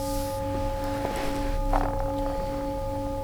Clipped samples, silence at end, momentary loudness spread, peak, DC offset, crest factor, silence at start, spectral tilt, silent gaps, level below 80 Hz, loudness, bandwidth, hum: under 0.1%; 0 s; 3 LU; -10 dBFS; under 0.1%; 18 dB; 0 s; -6 dB/octave; none; -32 dBFS; -30 LUFS; over 20 kHz; none